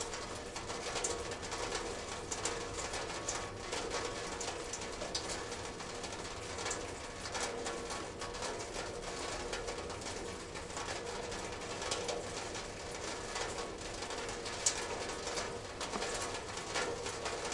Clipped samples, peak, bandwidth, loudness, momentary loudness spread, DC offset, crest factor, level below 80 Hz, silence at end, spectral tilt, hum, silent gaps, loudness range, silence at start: under 0.1%; -16 dBFS; 11.5 kHz; -40 LUFS; 5 LU; under 0.1%; 24 dB; -56 dBFS; 0 s; -2 dB/octave; none; none; 3 LU; 0 s